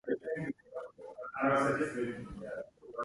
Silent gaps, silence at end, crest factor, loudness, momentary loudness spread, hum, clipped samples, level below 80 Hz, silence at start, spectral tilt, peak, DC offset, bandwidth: none; 0 s; 18 dB; -35 LUFS; 16 LU; none; under 0.1%; -64 dBFS; 0.05 s; -6.5 dB/octave; -18 dBFS; under 0.1%; 11.5 kHz